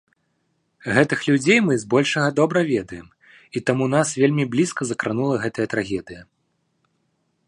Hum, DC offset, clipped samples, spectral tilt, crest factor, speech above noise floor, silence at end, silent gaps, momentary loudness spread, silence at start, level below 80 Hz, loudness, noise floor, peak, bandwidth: none; under 0.1%; under 0.1%; -5.5 dB/octave; 20 dB; 50 dB; 1.25 s; none; 12 LU; 0.85 s; -58 dBFS; -20 LUFS; -70 dBFS; -2 dBFS; 11.5 kHz